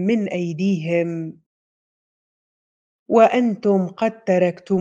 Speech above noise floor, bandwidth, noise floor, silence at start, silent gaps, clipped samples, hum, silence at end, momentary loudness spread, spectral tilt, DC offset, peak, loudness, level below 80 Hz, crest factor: over 71 dB; 7.6 kHz; under -90 dBFS; 0 s; 1.46-3.06 s; under 0.1%; none; 0 s; 9 LU; -7.5 dB/octave; under 0.1%; -2 dBFS; -19 LUFS; -70 dBFS; 20 dB